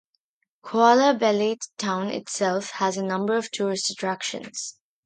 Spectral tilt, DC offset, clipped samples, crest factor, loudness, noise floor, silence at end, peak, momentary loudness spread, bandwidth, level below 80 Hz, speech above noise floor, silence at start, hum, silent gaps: -3.5 dB/octave; under 0.1%; under 0.1%; 20 dB; -24 LUFS; -75 dBFS; 0.35 s; -4 dBFS; 12 LU; 9.6 kHz; -76 dBFS; 52 dB; 0.65 s; none; none